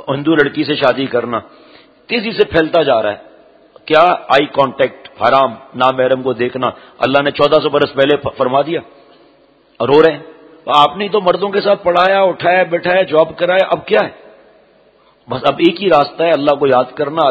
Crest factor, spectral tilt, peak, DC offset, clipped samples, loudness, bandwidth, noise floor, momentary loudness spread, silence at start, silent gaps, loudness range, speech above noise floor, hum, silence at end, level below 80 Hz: 14 dB; -6.5 dB/octave; 0 dBFS; under 0.1%; 0.2%; -13 LUFS; 8 kHz; -50 dBFS; 8 LU; 0.05 s; none; 3 LU; 37 dB; none; 0 s; -50 dBFS